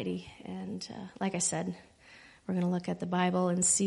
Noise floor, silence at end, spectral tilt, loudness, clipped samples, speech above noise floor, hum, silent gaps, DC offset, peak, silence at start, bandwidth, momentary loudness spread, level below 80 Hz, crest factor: -56 dBFS; 0 s; -4.5 dB/octave; -32 LUFS; under 0.1%; 24 dB; none; none; under 0.1%; -14 dBFS; 0 s; 11.5 kHz; 15 LU; -68 dBFS; 18 dB